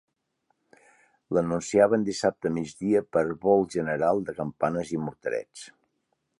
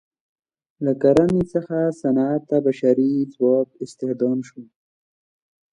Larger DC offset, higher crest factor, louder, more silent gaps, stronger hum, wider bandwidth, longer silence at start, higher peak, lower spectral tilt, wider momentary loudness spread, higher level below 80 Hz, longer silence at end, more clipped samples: neither; about the same, 22 dB vs 18 dB; second, -26 LUFS vs -20 LUFS; neither; neither; about the same, 11.5 kHz vs 10.5 kHz; first, 1.3 s vs 0.8 s; about the same, -6 dBFS vs -4 dBFS; second, -6 dB/octave vs -8.5 dB/octave; about the same, 10 LU vs 11 LU; second, -60 dBFS vs -54 dBFS; second, 0.7 s vs 1.1 s; neither